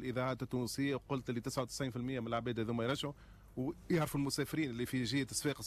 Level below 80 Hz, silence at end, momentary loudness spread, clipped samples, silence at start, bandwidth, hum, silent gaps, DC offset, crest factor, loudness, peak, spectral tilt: -60 dBFS; 0 s; 6 LU; under 0.1%; 0 s; 14 kHz; none; none; under 0.1%; 14 dB; -38 LUFS; -24 dBFS; -5 dB/octave